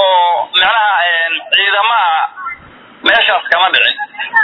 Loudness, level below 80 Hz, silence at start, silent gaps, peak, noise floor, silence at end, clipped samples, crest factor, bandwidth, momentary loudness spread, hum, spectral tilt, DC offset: -11 LUFS; -54 dBFS; 0 s; none; 0 dBFS; -38 dBFS; 0 s; 0.1%; 12 dB; 5.4 kHz; 10 LU; none; -2.5 dB/octave; under 0.1%